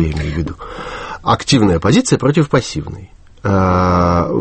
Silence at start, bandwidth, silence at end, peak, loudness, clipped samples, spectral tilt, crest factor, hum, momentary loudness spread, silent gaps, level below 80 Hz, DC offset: 0 s; 8.8 kHz; 0 s; 0 dBFS; -15 LUFS; under 0.1%; -6 dB/octave; 14 dB; none; 14 LU; none; -32 dBFS; under 0.1%